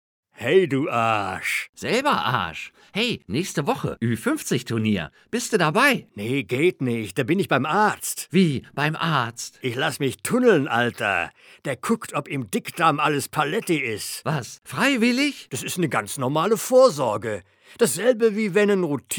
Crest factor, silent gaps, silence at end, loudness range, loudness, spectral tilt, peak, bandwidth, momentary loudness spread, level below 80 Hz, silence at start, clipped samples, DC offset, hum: 20 dB; 1.69-1.73 s; 0 s; 3 LU; -22 LUFS; -4.5 dB/octave; -4 dBFS; over 20 kHz; 10 LU; -62 dBFS; 0.4 s; under 0.1%; under 0.1%; none